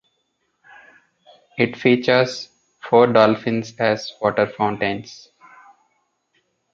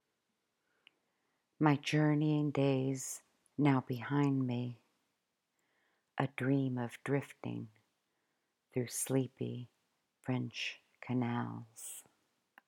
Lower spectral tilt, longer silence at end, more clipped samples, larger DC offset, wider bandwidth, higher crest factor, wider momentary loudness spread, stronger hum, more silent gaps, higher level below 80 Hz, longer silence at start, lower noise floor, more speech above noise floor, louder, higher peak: about the same, -6 dB/octave vs -6 dB/octave; first, 1.6 s vs 0.65 s; neither; neither; second, 7.6 kHz vs 17.5 kHz; about the same, 20 dB vs 24 dB; about the same, 18 LU vs 16 LU; neither; neither; first, -62 dBFS vs -84 dBFS; about the same, 1.55 s vs 1.6 s; second, -70 dBFS vs -84 dBFS; about the same, 52 dB vs 50 dB; first, -19 LUFS vs -35 LUFS; first, -2 dBFS vs -14 dBFS